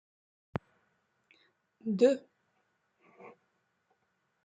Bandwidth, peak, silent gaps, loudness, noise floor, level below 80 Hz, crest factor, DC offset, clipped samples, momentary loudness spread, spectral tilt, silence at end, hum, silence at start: 9 kHz; -14 dBFS; none; -32 LUFS; -78 dBFS; -74 dBFS; 24 dB; under 0.1%; under 0.1%; 16 LU; -7 dB/octave; 1.15 s; none; 1.85 s